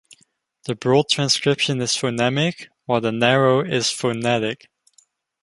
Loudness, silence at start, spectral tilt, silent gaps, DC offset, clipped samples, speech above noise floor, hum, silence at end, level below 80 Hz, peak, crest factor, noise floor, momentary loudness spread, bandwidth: -20 LUFS; 0.65 s; -4 dB/octave; none; under 0.1%; under 0.1%; 43 dB; none; 0.85 s; -62 dBFS; 0 dBFS; 20 dB; -63 dBFS; 10 LU; 11.5 kHz